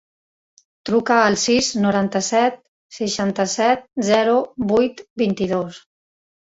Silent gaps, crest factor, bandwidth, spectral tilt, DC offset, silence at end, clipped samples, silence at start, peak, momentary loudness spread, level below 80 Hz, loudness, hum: 2.68-2.89 s, 5.10-5.16 s; 18 dB; 8 kHz; -4 dB/octave; under 0.1%; 0.8 s; under 0.1%; 0.85 s; -2 dBFS; 8 LU; -56 dBFS; -19 LUFS; none